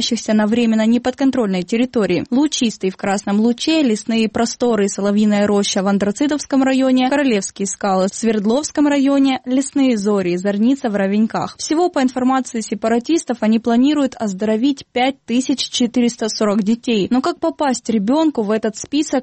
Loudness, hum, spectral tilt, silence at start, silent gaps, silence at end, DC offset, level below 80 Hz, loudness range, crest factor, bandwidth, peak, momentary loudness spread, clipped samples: -17 LUFS; none; -4.5 dB/octave; 0 s; none; 0 s; under 0.1%; -54 dBFS; 2 LU; 10 dB; 8.8 kHz; -6 dBFS; 5 LU; under 0.1%